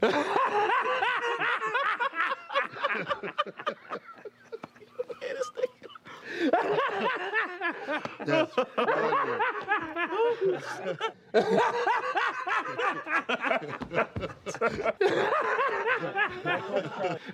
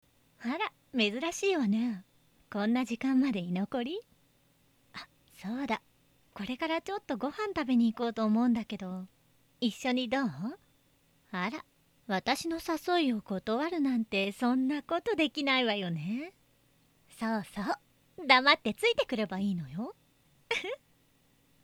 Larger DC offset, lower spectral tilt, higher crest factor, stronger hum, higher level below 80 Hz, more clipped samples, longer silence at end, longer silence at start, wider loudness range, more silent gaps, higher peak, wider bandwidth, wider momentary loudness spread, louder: neither; about the same, -4.5 dB/octave vs -5 dB/octave; second, 20 dB vs 26 dB; neither; about the same, -66 dBFS vs -68 dBFS; neither; second, 0 s vs 0.9 s; second, 0 s vs 0.4 s; about the same, 6 LU vs 7 LU; neither; second, -10 dBFS vs -6 dBFS; second, 12 kHz vs 16 kHz; second, 11 LU vs 14 LU; about the same, -29 LUFS vs -31 LUFS